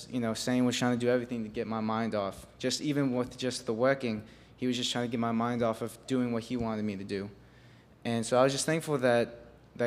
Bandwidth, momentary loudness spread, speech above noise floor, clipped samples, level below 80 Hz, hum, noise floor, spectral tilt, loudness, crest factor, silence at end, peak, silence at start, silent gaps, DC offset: 15.5 kHz; 9 LU; 26 dB; under 0.1%; -62 dBFS; none; -56 dBFS; -5 dB/octave; -31 LUFS; 20 dB; 0 s; -10 dBFS; 0 s; none; under 0.1%